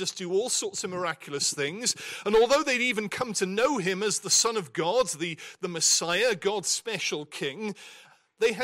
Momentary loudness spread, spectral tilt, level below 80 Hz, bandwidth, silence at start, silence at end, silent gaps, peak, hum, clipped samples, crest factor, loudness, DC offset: 11 LU; -2 dB/octave; -64 dBFS; 16 kHz; 0 s; 0 s; none; -12 dBFS; none; under 0.1%; 16 dB; -26 LUFS; under 0.1%